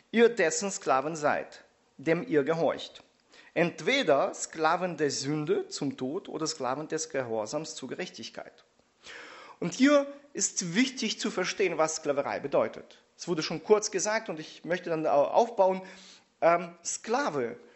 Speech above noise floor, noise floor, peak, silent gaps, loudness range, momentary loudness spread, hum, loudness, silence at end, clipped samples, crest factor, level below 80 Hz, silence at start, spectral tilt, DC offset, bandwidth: 30 dB; -58 dBFS; -8 dBFS; none; 5 LU; 14 LU; none; -29 LUFS; 0.2 s; under 0.1%; 20 dB; -76 dBFS; 0.15 s; -3.5 dB/octave; under 0.1%; 8.2 kHz